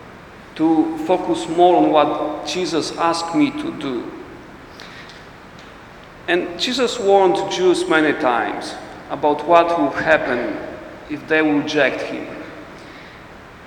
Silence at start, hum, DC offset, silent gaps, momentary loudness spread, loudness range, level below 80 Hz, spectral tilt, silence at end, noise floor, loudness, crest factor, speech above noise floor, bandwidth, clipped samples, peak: 0 s; none; under 0.1%; none; 23 LU; 7 LU; -52 dBFS; -4.5 dB/octave; 0 s; -40 dBFS; -18 LUFS; 20 dB; 22 dB; 11.5 kHz; under 0.1%; 0 dBFS